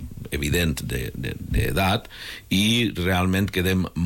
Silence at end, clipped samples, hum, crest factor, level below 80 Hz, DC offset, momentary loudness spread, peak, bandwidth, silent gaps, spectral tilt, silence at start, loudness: 0 s; under 0.1%; none; 12 dB; -36 dBFS; under 0.1%; 11 LU; -12 dBFS; 17 kHz; none; -5 dB/octave; 0 s; -23 LUFS